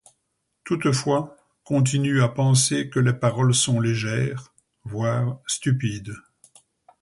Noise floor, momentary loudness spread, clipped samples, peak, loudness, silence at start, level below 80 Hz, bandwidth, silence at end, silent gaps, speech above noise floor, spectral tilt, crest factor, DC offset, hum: -75 dBFS; 16 LU; under 0.1%; -6 dBFS; -22 LUFS; 0.65 s; -56 dBFS; 11.5 kHz; 0.8 s; none; 54 dB; -5 dB/octave; 16 dB; under 0.1%; none